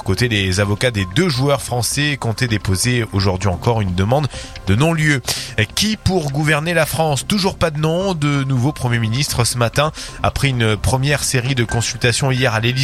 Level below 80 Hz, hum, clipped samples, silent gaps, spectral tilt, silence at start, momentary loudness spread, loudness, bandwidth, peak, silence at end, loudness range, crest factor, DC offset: -36 dBFS; none; under 0.1%; none; -4.5 dB/octave; 0 s; 3 LU; -17 LUFS; 15.5 kHz; 0 dBFS; 0 s; 1 LU; 16 dB; under 0.1%